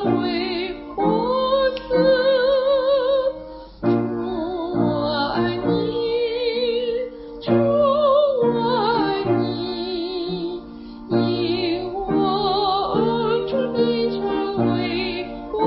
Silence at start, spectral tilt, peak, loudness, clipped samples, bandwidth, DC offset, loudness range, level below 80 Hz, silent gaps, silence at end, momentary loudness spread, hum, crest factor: 0 s; -11 dB/octave; -6 dBFS; -21 LUFS; under 0.1%; 5.8 kHz; under 0.1%; 3 LU; -48 dBFS; none; 0 s; 9 LU; none; 14 dB